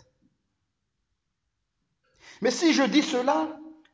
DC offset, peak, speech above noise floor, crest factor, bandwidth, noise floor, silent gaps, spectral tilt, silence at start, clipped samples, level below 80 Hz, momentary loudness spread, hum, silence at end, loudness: under 0.1%; -10 dBFS; 57 dB; 20 dB; 8 kHz; -80 dBFS; none; -3.5 dB/octave; 2.25 s; under 0.1%; -76 dBFS; 11 LU; none; 0.2 s; -24 LUFS